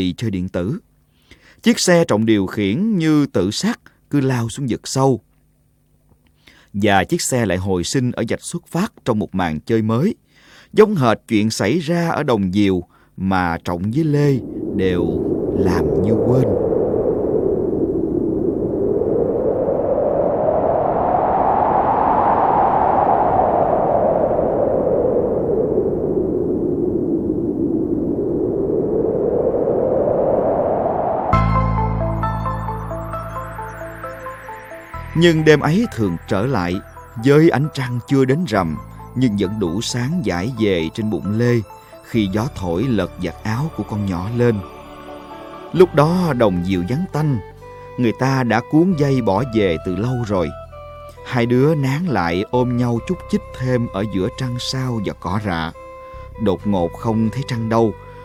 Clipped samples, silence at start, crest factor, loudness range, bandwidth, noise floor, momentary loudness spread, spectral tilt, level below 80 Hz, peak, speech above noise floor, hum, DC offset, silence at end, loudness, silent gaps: under 0.1%; 0 s; 18 dB; 5 LU; 16 kHz; -58 dBFS; 10 LU; -6.5 dB/octave; -38 dBFS; 0 dBFS; 41 dB; none; under 0.1%; 0 s; -18 LUFS; none